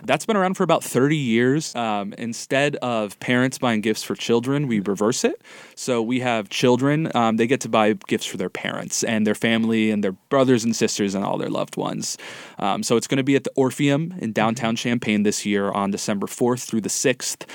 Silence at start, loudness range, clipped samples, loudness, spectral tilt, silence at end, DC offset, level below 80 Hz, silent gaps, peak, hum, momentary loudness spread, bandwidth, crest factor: 0 s; 1 LU; under 0.1%; -22 LUFS; -4.5 dB/octave; 0 s; under 0.1%; -68 dBFS; none; -2 dBFS; none; 7 LU; 18 kHz; 18 dB